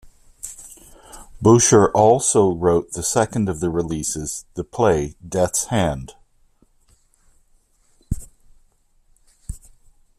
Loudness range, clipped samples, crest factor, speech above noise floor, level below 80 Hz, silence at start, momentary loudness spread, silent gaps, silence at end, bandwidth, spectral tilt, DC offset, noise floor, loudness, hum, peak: 22 LU; under 0.1%; 20 dB; 40 dB; -42 dBFS; 0.45 s; 24 LU; none; 0.6 s; 14.5 kHz; -5 dB/octave; under 0.1%; -58 dBFS; -19 LUFS; none; 0 dBFS